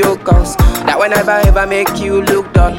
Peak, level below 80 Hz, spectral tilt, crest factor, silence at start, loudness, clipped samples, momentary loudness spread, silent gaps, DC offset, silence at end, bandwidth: 0 dBFS; -16 dBFS; -5.5 dB/octave; 10 dB; 0 s; -12 LUFS; under 0.1%; 3 LU; none; under 0.1%; 0 s; 17 kHz